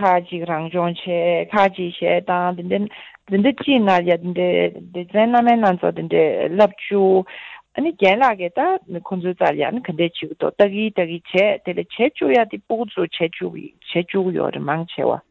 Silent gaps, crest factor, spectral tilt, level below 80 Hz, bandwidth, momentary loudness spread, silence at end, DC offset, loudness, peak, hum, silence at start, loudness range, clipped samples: none; 16 dB; -7.5 dB/octave; -62 dBFS; 7.6 kHz; 9 LU; 0.1 s; under 0.1%; -19 LUFS; -4 dBFS; none; 0 s; 3 LU; under 0.1%